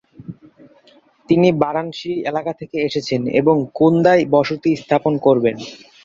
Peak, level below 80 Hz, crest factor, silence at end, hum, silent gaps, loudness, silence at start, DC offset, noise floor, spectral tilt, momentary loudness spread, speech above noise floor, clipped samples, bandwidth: -2 dBFS; -56 dBFS; 16 dB; 0.3 s; none; none; -17 LUFS; 0.2 s; under 0.1%; -52 dBFS; -7 dB/octave; 12 LU; 35 dB; under 0.1%; 7.6 kHz